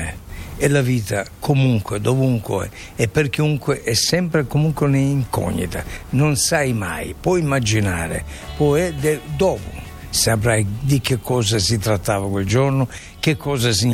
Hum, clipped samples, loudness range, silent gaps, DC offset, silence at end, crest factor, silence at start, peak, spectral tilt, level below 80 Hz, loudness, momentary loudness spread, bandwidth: none; under 0.1%; 1 LU; none; under 0.1%; 0 s; 16 dB; 0 s; -4 dBFS; -5 dB/octave; -38 dBFS; -19 LUFS; 9 LU; 16.5 kHz